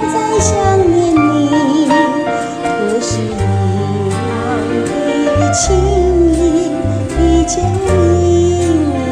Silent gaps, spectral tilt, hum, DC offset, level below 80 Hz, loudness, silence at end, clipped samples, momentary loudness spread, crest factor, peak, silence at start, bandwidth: none; -6 dB/octave; none; 0.2%; -24 dBFS; -13 LUFS; 0 s; under 0.1%; 6 LU; 12 dB; 0 dBFS; 0 s; 11 kHz